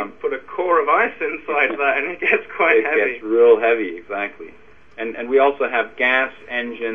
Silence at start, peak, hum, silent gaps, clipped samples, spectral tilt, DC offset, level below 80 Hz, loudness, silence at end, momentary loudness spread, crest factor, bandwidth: 0 s; -2 dBFS; none; none; under 0.1%; -5.5 dB/octave; 0.5%; -60 dBFS; -18 LUFS; 0 s; 11 LU; 18 dB; 3.8 kHz